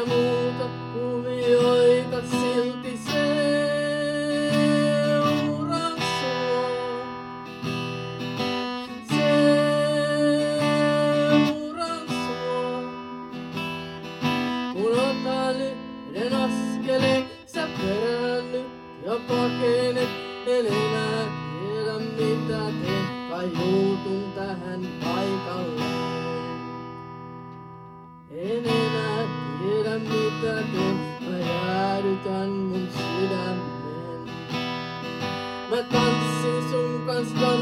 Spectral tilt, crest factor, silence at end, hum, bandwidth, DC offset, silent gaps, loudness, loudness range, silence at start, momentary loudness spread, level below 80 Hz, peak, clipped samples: -6 dB/octave; 18 dB; 0 s; none; 16.5 kHz; under 0.1%; none; -25 LUFS; 6 LU; 0 s; 12 LU; -60 dBFS; -8 dBFS; under 0.1%